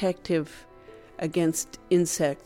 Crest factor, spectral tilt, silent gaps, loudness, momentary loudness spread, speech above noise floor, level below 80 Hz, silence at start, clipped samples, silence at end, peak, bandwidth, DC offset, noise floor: 16 dB; -5 dB/octave; none; -27 LUFS; 17 LU; 23 dB; -58 dBFS; 0 s; under 0.1%; 0.1 s; -12 dBFS; 16.5 kHz; under 0.1%; -49 dBFS